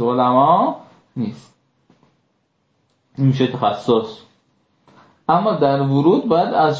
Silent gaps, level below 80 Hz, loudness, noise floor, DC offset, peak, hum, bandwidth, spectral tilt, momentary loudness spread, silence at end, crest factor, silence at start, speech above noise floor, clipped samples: none; -62 dBFS; -17 LUFS; -66 dBFS; under 0.1%; -2 dBFS; none; 7.8 kHz; -8.5 dB/octave; 14 LU; 0 s; 16 dB; 0 s; 50 dB; under 0.1%